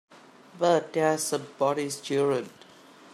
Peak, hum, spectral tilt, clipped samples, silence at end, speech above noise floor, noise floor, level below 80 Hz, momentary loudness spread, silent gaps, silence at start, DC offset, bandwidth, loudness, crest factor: -10 dBFS; none; -4 dB/octave; under 0.1%; 0.65 s; 26 dB; -52 dBFS; -76 dBFS; 7 LU; none; 0.15 s; under 0.1%; 14.5 kHz; -27 LUFS; 18 dB